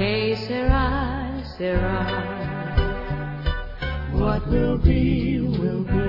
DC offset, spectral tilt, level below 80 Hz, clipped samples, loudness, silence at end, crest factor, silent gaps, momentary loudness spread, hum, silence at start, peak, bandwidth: under 0.1%; -9 dB/octave; -28 dBFS; under 0.1%; -24 LUFS; 0 s; 18 dB; none; 9 LU; none; 0 s; -4 dBFS; 5.8 kHz